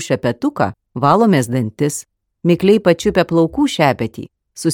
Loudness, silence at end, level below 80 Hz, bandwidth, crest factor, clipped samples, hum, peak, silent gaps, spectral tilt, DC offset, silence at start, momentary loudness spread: -16 LUFS; 0 s; -46 dBFS; 17.5 kHz; 16 dB; under 0.1%; none; 0 dBFS; none; -6 dB/octave; under 0.1%; 0 s; 10 LU